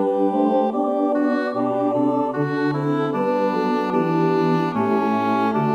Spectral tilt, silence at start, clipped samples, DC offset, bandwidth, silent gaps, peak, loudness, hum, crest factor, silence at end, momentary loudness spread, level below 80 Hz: -8.5 dB/octave; 0 s; under 0.1%; under 0.1%; 9 kHz; none; -6 dBFS; -20 LUFS; none; 12 dB; 0 s; 3 LU; -68 dBFS